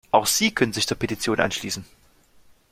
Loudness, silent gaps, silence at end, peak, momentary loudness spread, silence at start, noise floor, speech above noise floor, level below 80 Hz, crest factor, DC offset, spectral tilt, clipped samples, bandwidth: -23 LUFS; none; 0.85 s; -2 dBFS; 10 LU; 0.15 s; -55 dBFS; 31 dB; -52 dBFS; 22 dB; under 0.1%; -3 dB/octave; under 0.1%; 16 kHz